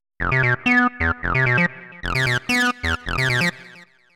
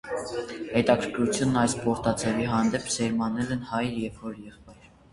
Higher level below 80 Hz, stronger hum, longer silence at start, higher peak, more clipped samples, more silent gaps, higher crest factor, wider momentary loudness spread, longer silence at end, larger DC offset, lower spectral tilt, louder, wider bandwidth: first, -36 dBFS vs -52 dBFS; neither; first, 0.2 s vs 0.05 s; about the same, -6 dBFS vs -6 dBFS; neither; neither; about the same, 16 dB vs 20 dB; second, 6 LU vs 11 LU; about the same, 0.3 s vs 0.4 s; neither; about the same, -5 dB/octave vs -5 dB/octave; first, -19 LUFS vs -27 LUFS; first, 16.5 kHz vs 11.5 kHz